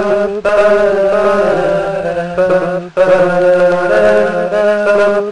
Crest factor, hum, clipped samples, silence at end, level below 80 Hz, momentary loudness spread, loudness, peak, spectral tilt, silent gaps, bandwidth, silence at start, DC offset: 10 dB; none; under 0.1%; 0 s; -42 dBFS; 5 LU; -11 LUFS; 0 dBFS; -6 dB/octave; none; 10.5 kHz; 0 s; 2%